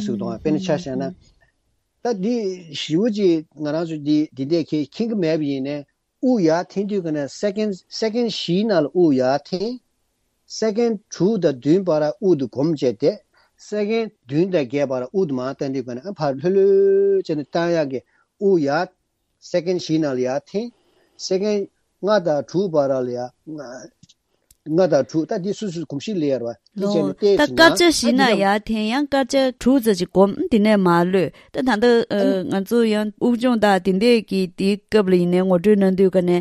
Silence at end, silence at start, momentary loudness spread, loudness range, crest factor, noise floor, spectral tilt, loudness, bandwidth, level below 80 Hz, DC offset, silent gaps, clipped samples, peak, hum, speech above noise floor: 0 s; 0 s; 11 LU; 6 LU; 20 dB; -69 dBFS; -6 dB/octave; -20 LUFS; 14 kHz; -56 dBFS; under 0.1%; none; under 0.1%; 0 dBFS; none; 50 dB